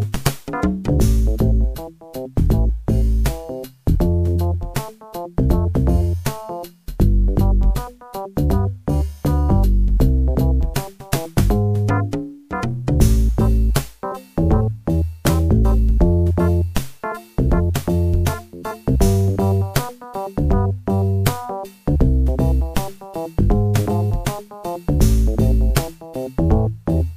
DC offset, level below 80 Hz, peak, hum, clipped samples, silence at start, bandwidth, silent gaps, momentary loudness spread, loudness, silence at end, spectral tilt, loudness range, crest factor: under 0.1%; -20 dBFS; 0 dBFS; none; under 0.1%; 0 s; 15.5 kHz; none; 12 LU; -20 LUFS; 0 s; -7 dB/octave; 2 LU; 16 dB